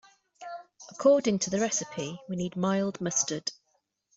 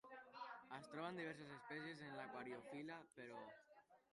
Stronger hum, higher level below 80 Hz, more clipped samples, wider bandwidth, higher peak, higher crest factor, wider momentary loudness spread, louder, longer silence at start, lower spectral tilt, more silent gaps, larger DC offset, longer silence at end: neither; first, -68 dBFS vs under -90 dBFS; neither; second, 8.2 kHz vs 11 kHz; first, -10 dBFS vs -38 dBFS; about the same, 20 dB vs 18 dB; first, 19 LU vs 7 LU; first, -28 LUFS vs -54 LUFS; first, 0.4 s vs 0.05 s; second, -4 dB/octave vs -5.5 dB/octave; neither; neither; first, 0.65 s vs 0.1 s